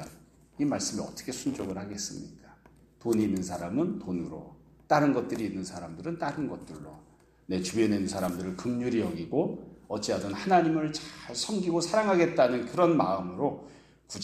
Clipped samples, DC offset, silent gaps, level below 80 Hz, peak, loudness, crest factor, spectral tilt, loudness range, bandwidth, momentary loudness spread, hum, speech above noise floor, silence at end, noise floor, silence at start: under 0.1%; under 0.1%; none; -62 dBFS; -8 dBFS; -29 LUFS; 20 dB; -5 dB/octave; 6 LU; 15 kHz; 14 LU; none; 29 dB; 0 s; -58 dBFS; 0 s